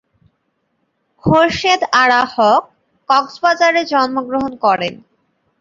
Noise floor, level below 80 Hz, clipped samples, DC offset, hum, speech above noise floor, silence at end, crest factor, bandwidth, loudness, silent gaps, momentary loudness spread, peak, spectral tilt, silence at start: -67 dBFS; -50 dBFS; under 0.1%; under 0.1%; none; 53 dB; 0.65 s; 16 dB; 7.6 kHz; -14 LUFS; none; 7 LU; 0 dBFS; -4.5 dB/octave; 1.25 s